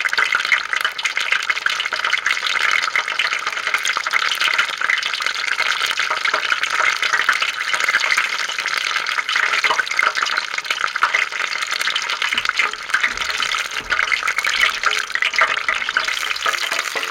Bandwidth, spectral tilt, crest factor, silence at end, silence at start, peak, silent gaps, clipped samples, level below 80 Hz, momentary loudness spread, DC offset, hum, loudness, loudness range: 17 kHz; 2 dB/octave; 18 dB; 0 s; 0 s; -2 dBFS; none; under 0.1%; -56 dBFS; 4 LU; under 0.1%; none; -18 LUFS; 1 LU